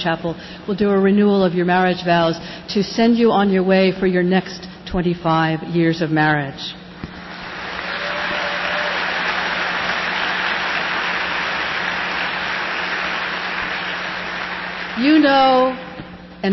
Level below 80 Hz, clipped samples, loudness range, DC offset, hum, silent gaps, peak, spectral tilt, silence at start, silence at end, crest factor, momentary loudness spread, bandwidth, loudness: -48 dBFS; under 0.1%; 5 LU; under 0.1%; none; none; -4 dBFS; -6 dB/octave; 0 s; 0 s; 14 dB; 13 LU; 6 kHz; -18 LUFS